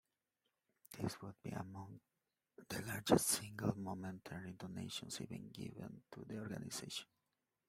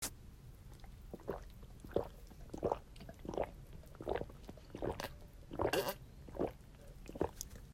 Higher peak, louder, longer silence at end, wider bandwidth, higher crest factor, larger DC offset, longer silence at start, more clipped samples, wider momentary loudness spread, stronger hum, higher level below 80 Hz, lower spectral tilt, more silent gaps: first, -16 dBFS vs -20 dBFS; about the same, -43 LUFS vs -43 LUFS; first, 0.65 s vs 0 s; about the same, 16 kHz vs 16 kHz; about the same, 28 dB vs 24 dB; neither; first, 0.9 s vs 0 s; neither; about the same, 18 LU vs 17 LU; neither; second, -72 dBFS vs -56 dBFS; about the same, -4 dB/octave vs -4.5 dB/octave; neither